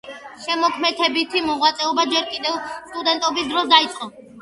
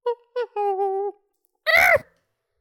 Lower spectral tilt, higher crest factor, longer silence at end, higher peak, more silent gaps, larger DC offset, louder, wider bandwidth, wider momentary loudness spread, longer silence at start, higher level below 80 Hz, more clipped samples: about the same, -1.5 dB/octave vs -2.5 dB/octave; about the same, 20 dB vs 18 dB; second, 0 s vs 0.6 s; first, 0 dBFS vs -4 dBFS; neither; neither; about the same, -19 LUFS vs -21 LUFS; second, 11.5 kHz vs 19 kHz; about the same, 15 LU vs 14 LU; about the same, 0.05 s vs 0.05 s; about the same, -60 dBFS vs -58 dBFS; neither